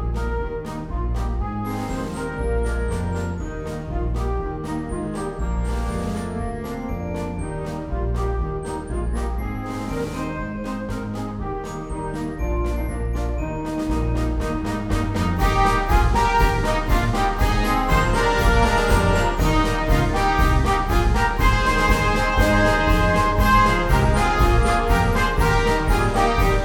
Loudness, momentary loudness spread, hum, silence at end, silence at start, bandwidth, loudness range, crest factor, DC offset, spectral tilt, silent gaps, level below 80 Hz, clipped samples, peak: -22 LUFS; 10 LU; none; 0 s; 0 s; 19 kHz; 9 LU; 18 dB; under 0.1%; -5.5 dB/octave; none; -24 dBFS; under 0.1%; -2 dBFS